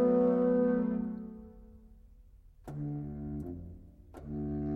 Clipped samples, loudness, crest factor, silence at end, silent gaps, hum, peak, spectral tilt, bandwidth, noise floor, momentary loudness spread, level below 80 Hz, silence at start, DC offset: under 0.1%; -33 LUFS; 16 dB; 0 s; none; none; -18 dBFS; -11 dB/octave; 3.2 kHz; -57 dBFS; 25 LU; -52 dBFS; 0 s; under 0.1%